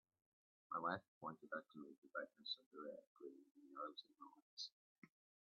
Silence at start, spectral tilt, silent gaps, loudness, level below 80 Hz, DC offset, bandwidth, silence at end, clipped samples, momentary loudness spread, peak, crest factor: 0.7 s; -1.5 dB/octave; 1.08-1.21 s, 1.98-2.02 s, 2.66-2.71 s, 3.07-3.15 s, 3.51-3.55 s, 4.42-4.57 s, 4.72-5.02 s; -52 LUFS; under -90 dBFS; under 0.1%; 6.2 kHz; 0.45 s; under 0.1%; 14 LU; -30 dBFS; 24 dB